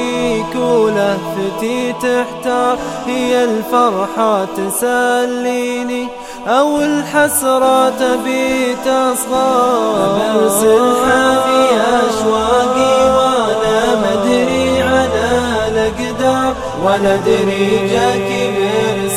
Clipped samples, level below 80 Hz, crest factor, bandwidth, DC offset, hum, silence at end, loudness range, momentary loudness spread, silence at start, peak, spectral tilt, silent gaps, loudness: under 0.1%; -40 dBFS; 12 dB; 16.5 kHz; under 0.1%; none; 0 s; 4 LU; 6 LU; 0 s; 0 dBFS; -4 dB/octave; none; -14 LUFS